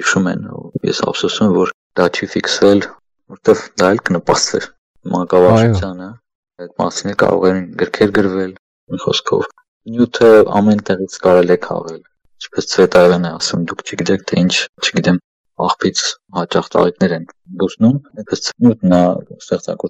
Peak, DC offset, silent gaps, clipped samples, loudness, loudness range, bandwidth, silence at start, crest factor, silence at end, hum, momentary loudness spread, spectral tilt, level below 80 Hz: 0 dBFS; under 0.1%; 1.74-1.90 s, 4.78-4.94 s, 6.35-6.43 s, 8.59-8.87 s, 9.68-9.80 s, 14.69-14.73 s, 15.24-15.44 s; under 0.1%; -15 LUFS; 3 LU; 11 kHz; 0 s; 14 dB; 0 s; none; 14 LU; -5 dB/octave; -48 dBFS